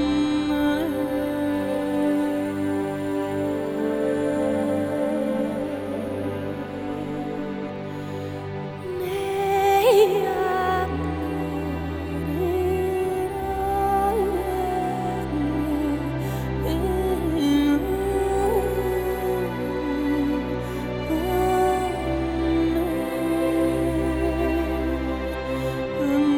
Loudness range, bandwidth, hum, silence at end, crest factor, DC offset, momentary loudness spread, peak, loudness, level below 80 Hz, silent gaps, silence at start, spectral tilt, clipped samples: 4 LU; 18.5 kHz; none; 0 s; 18 dB; under 0.1%; 8 LU; -6 dBFS; -24 LUFS; -38 dBFS; none; 0 s; -6.5 dB/octave; under 0.1%